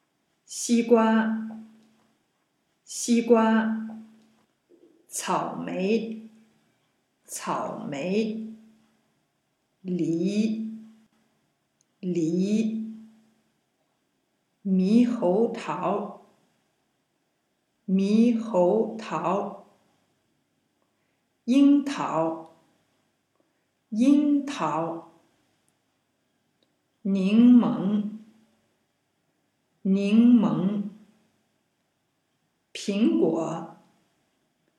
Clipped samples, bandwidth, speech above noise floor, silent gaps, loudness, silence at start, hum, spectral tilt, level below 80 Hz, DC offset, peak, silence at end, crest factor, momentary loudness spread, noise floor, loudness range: under 0.1%; 12.5 kHz; 51 dB; none; -24 LUFS; 0.5 s; none; -6 dB/octave; -82 dBFS; under 0.1%; -6 dBFS; 1.05 s; 20 dB; 19 LU; -74 dBFS; 7 LU